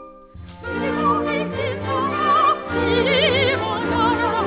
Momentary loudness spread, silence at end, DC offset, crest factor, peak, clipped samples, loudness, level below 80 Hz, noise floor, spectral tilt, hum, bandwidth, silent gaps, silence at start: 8 LU; 0 s; under 0.1%; 14 dB; -6 dBFS; under 0.1%; -19 LUFS; -40 dBFS; -40 dBFS; -9 dB/octave; none; 4 kHz; none; 0 s